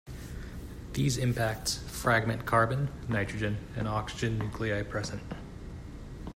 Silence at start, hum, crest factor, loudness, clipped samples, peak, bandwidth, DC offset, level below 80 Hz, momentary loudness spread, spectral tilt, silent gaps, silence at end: 0.05 s; none; 20 dB; -31 LUFS; under 0.1%; -12 dBFS; 16 kHz; under 0.1%; -46 dBFS; 17 LU; -5 dB/octave; none; 0.05 s